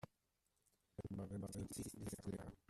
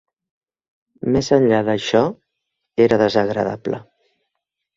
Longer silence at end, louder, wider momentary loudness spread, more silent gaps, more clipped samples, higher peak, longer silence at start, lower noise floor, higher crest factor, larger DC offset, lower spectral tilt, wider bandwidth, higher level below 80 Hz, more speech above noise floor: second, 0.15 s vs 0.95 s; second, -50 LUFS vs -18 LUFS; second, 9 LU vs 12 LU; neither; neither; second, -36 dBFS vs -2 dBFS; second, 0.05 s vs 1.05 s; first, -86 dBFS vs -79 dBFS; about the same, 16 dB vs 18 dB; neither; about the same, -6 dB/octave vs -6 dB/octave; first, 15 kHz vs 7.8 kHz; second, -68 dBFS vs -50 dBFS; second, 36 dB vs 62 dB